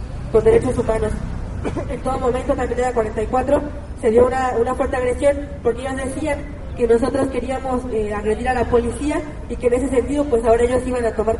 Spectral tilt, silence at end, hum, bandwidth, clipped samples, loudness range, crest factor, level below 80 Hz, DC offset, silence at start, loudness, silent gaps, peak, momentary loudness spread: -6.5 dB/octave; 0 s; none; 11.5 kHz; under 0.1%; 2 LU; 16 dB; -30 dBFS; under 0.1%; 0 s; -20 LUFS; none; -2 dBFS; 9 LU